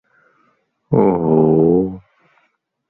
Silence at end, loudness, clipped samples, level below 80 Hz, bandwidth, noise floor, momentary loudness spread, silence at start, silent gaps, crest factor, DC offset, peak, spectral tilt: 0.9 s; -15 LUFS; under 0.1%; -48 dBFS; 3.2 kHz; -65 dBFS; 11 LU; 0.9 s; none; 16 dB; under 0.1%; -2 dBFS; -14 dB/octave